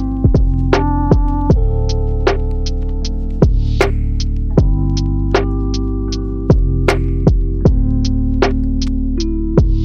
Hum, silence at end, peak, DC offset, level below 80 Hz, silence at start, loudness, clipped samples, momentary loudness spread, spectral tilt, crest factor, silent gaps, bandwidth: none; 0 s; 0 dBFS; under 0.1%; -16 dBFS; 0 s; -16 LUFS; under 0.1%; 6 LU; -7.5 dB/octave; 12 dB; none; 7.2 kHz